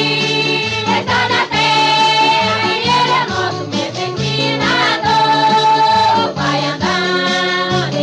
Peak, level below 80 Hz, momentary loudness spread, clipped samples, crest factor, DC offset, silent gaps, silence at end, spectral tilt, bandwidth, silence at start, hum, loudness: -2 dBFS; -48 dBFS; 7 LU; under 0.1%; 12 dB; under 0.1%; none; 0 s; -4 dB/octave; 11 kHz; 0 s; none; -13 LUFS